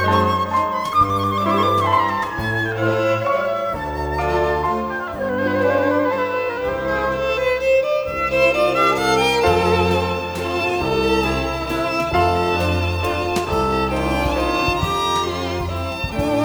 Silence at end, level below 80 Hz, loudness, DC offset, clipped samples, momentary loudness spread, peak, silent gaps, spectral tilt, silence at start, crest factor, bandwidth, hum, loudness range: 0 s; -36 dBFS; -19 LUFS; under 0.1%; under 0.1%; 7 LU; -4 dBFS; none; -5.5 dB/octave; 0 s; 14 dB; over 20 kHz; none; 3 LU